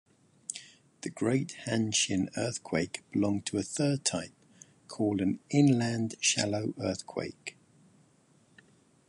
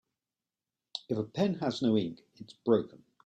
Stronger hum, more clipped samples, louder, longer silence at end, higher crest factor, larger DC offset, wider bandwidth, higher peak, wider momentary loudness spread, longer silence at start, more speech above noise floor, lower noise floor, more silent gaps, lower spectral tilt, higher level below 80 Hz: neither; neither; about the same, -30 LUFS vs -31 LUFS; first, 1.6 s vs 0.3 s; about the same, 20 dB vs 20 dB; neither; first, 11.5 kHz vs 8.8 kHz; about the same, -12 dBFS vs -12 dBFS; about the same, 16 LU vs 17 LU; second, 0.5 s vs 0.95 s; second, 35 dB vs over 59 dB; second, -65 dBFS vs under -90 dBFS; neither; second, -4.5 dB/octave vs -7 dB/octave; first, -62 dBFS vs -72 dBFS